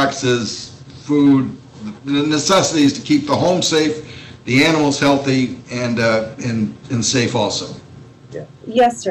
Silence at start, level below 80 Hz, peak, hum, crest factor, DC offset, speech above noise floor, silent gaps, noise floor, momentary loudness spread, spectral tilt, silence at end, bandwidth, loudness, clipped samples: 0 s; -52 dBFS; -6 dBFS; none; 12 dB; under 0.1%; 23 dB; none; -39 dBFS; 19 LU; -4.5 dB/octave; 0 s; 12.5 kHz; -16 LUFS; under 0.1%